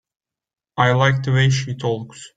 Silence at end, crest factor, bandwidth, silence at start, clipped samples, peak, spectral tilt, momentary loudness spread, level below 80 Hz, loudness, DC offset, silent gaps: 0.1 s; 18 dB; 9 kHz; 0.75 s; under 0.1%; -2 dBFS; -5.5 dB/octave; 11 LU; -52 dBFS; -19 LUFS; under 0.1%; none